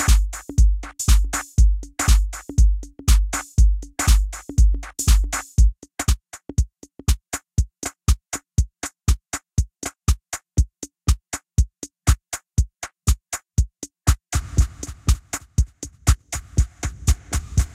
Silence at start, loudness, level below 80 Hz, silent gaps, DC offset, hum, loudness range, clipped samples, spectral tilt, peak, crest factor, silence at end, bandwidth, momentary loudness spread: 0 s; -23 LUFS; -22 dBFS; none; under 0.1%; none; 5 LU; under 0.1%; -4 dB/octave; -2 dBFS; 18 dB; 0.05 s; 15.5 kHz; 7 LU